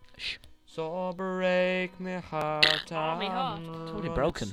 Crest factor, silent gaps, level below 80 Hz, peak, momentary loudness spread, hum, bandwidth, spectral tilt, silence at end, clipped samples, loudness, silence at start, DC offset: 28 dB; none; -52 dBFS; -4 dBFS; 15 LU; none; 15 kHz; -4.5 dB/octave; 0 s; under 0.1%; -29 LUFS; 0 s; under 0.1%